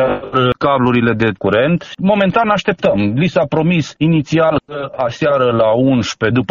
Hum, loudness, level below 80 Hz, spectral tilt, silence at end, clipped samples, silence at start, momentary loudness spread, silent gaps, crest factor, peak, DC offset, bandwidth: none; -14 LUFS; -44 dBFS; -5.5 dB/octave; 0.05 s; under 0.1%; 0 s; 4 LU; none; 14 dB; 0 dBFS; under 0.1%; 7.4 kHz